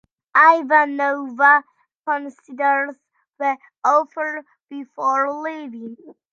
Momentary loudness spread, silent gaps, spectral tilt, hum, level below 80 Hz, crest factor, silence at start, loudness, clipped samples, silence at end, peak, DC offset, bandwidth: 21 LU; 1.95-2.03 s, 4.63-4.67 s; -3.5 dB/octave; none; -84 dBFS; 18 dB; 0.35 s; -18 LUFS; under 0.1%; 0.2 s; -2 dBFS; under 0.1%; 7.4 kHz